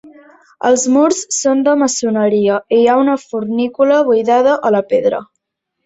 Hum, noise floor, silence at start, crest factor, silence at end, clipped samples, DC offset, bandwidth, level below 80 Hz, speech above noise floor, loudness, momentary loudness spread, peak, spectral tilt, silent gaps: none; -73 dBFS; 0.05 s; 12 dB; 0.6 s; under 0.1%; under 0.1%; 8.2 kHz; -60 dBFS; 60 dB; -13 LUFS; 7 LU; -2 dBFS; -4 dB/octave; none